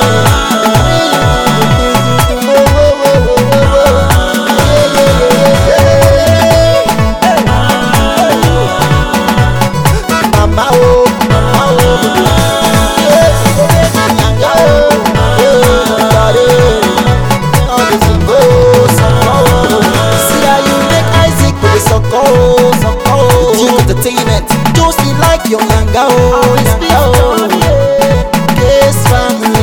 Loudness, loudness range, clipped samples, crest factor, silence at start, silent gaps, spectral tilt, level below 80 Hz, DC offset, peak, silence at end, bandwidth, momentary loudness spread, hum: -8 LUFS; 1 LU; 0.3%; 8 dB; 0 s; none; -5 dB/octave; -18 dBFS; 3%; 0 dBFS; 0 s; 18 kHz; 3 LU; none